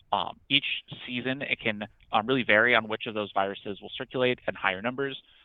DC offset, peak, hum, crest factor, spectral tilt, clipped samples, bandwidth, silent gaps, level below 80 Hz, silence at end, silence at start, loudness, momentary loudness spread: under 0.1%; -4 dBFS; none; 24 dB; -8 dB/octave; under 0.1%; 4.8 kHz; none; -64 dBFS; 0.25 s; 0.1 s; -27 LUFS; 13 LU